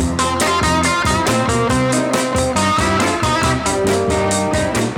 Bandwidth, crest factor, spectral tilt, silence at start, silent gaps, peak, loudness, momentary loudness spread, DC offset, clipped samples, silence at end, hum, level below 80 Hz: 19 kHz; 14 dB; -4 dB/octave; 0 s; none; -2 dBFS; -16 LUFS; 2 LU; under 0.1%; under 0.1%; 0 s; none; -32 dBFS